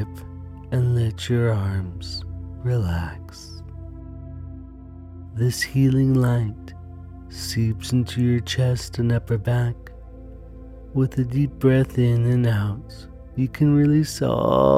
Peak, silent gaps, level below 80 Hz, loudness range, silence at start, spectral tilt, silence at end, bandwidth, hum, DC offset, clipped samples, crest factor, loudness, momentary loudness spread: -4 dBFS; none; -40 dBFS; 8 LU; 0 s; -7 dB/octave; 0 s; 14.5 kHz; none; under 0.1%; under 0.1%; 18 dB; -22 LUFS; 21 LU